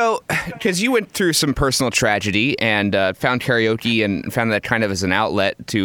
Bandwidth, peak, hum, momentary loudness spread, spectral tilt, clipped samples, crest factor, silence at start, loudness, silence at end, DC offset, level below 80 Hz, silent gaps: 19.5 kHz; -2 dBFS; none; 4 LU; -4 dB/octave; under 0.1%; 16 dB; 0 s; -18 LUFS; 0 s; under 0.1%; -42 dBFS; none